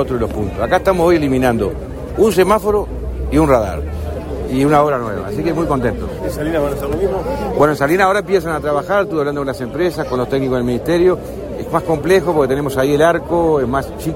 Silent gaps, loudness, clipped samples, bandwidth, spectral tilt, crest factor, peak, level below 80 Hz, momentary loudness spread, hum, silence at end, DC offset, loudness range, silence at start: none; -16 LUFS; under 0.1%; 16.5 kHz; -6.5 dB/octave; 14 dB; 0 dBFS; -30 dBFS; 9 LU; none; 0 s; under 0.1%; 2 LU; 0 s